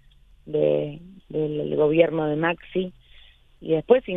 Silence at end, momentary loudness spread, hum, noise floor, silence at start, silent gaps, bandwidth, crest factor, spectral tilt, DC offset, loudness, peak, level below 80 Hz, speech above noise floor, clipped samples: 0 s; 14 LU; none; -51 dBFS; 0.45 s; none; 3.9 kHz; 20 dB; -9.5 dB/octave; under 0.1%; -24 LUFS; -4 dBFS; -54 dBFS; 29 dB; under 0.1%